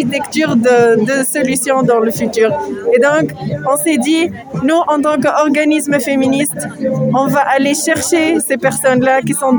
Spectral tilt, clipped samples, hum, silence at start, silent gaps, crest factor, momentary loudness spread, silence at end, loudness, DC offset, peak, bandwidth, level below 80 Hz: -4.5 dB/octave; under 0.1%; none; 0 s; none; 12 dB; 5 LU; 0 s; -13 LUFS; under 0.1%; 0 dBFS; over 20 kHz; -52 dBFS